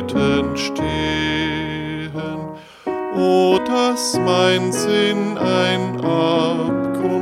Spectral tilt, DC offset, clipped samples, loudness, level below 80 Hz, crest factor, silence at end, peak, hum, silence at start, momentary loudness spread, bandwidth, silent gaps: -5 dB/octave; under 0.1%; under 0.1%; -18 LUFS; -44 dBFS; 14 dB; 0 s; -4 dBFS; none; 0 s; 11 LU; 15.5 kHz; none